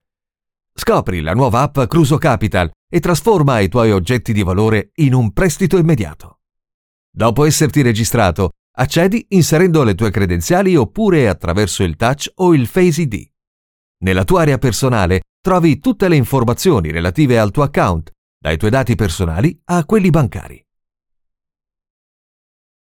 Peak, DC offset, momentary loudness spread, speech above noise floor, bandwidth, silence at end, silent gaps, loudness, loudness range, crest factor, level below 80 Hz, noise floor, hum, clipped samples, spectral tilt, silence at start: -2 dBFS; under 0.1%; 6 LU; 71 dB; 18 kHz; 2.35 s; 2.76-2.88 s, 6.74-7.13 s, 8.59-8.74 s, 13.47-13.95 s, 15.29-15.43 s, 18.18-18.41 s; -14 LUFS; 3 LU; 14 dB; -34 dBFS; -84 dBFS; none; under 0.1%; -6 dB/octave; 0.8 s